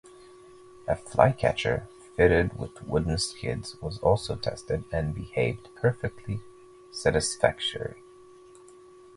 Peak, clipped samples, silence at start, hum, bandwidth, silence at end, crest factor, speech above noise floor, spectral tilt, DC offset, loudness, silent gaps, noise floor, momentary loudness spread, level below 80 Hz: -2 dBFS; under 0.1%; 0.05 s; none; 11.5 kHz; 1.15 s; 26 dB; 25 dB; -5 dB/octave; under 0.1%; -28 LUFS; none; -51 dBFS; 14 LU; -44 dBFS